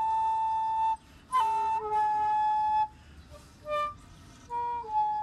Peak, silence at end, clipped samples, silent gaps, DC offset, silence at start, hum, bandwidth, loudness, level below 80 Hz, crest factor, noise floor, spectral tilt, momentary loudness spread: -18 dBFS; 0 s; under 0.1%; none; under 0.1%; 0 s; none; 12 kHz; -29 LUFS; -58 dBFS; 12 dB; -51 dBFS; -3.5 dB/octave; 9 LU